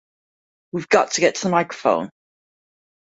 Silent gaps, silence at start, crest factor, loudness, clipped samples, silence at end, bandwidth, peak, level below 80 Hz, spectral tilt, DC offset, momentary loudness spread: none; 0.75 s; 22 dB; -19 LUFS; under 0.1%; 0.95 s; 8 kHz; -2 dBFS; -64 dBFS; -4 dB/octave; under 0.1%; 13 LU